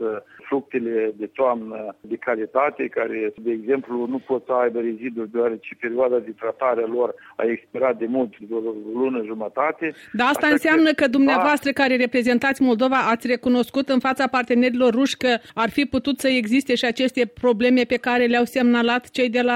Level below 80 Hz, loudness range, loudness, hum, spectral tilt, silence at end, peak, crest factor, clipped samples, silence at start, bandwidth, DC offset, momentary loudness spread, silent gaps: -60 dBFS; 6 LU; -21 LUFS; none; -4.5 dB/octave; 0 s; -6 dBFS; 16 dB; under 0.1%; 0 s; 16 kHz; under 0.1%; 10 LU; none